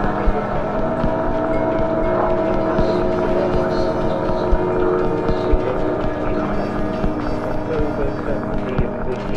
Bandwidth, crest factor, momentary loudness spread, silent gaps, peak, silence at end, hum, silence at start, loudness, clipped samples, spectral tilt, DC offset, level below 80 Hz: 7 kHz; 16 dB; 4 LU; none; -2 dBFS; 0 s; none; 0 s; -20 LUFS; under 0.1%; -8.5 dB/octave; under 0.1%; -26 dBFS